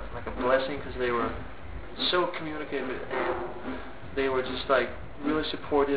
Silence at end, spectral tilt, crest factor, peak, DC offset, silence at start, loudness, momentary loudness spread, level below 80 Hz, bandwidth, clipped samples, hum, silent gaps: 0 s; -2.5 dB/octave; 18 dB; -10 dBFS; 1%; 0 s; -29 LUFS; 12 LU; -46 dBFS; 4 kHz; under 0.1%; none; none